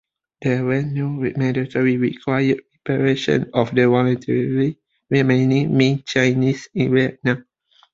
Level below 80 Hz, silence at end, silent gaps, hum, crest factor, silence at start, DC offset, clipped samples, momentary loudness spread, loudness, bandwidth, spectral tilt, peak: -56 dBFS; 0.5 s; none; none; 18 dB; 0.4 s; under 0.1%; under 0.1%; 7 LU; -19 LUFS; 7.6 kHz; -7 dB/octave; -2 dBFS